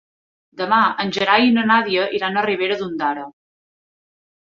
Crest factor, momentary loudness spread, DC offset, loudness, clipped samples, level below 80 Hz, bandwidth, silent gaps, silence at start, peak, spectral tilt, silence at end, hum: 18 dB; 10 LU; under 0.1%; -18 LUFS; under 0.1%; -64 dBFS; 7.2 kHz; none; 0.55 s; -2 dBFS; -5 dB/octave; 1.2 s; none